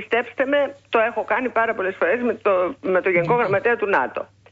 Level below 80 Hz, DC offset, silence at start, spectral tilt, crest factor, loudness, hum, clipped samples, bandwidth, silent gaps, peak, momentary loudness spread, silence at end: -62 dBFS; under 0.1%; 0 s; -7 dB/octave; 14 dB; -21 LUFS; none; under 0.1%; 7.6 kHz; none; -6 dBFS; 4 LU; 0.25 s